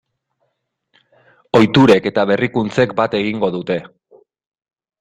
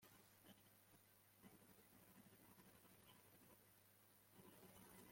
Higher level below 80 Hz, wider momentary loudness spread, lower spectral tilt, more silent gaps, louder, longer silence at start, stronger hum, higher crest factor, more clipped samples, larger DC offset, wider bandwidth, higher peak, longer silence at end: first, -52 dBFS vs under -90 dBFS; first, 10 LU vs 4 LU; first, -6.5 dB/octave vs -3.5 dB/octave; neither; first, -15 LUFS vs -68 LUFS; first, 1.55 s vs 0 s; neither; about the same, 16 dB vs 18 dB; neither; neither; second, 11 kHz vs 16.5 kHz; first, 0 dBFS vs -52 dBFS; first, 1.15 s vs 0 s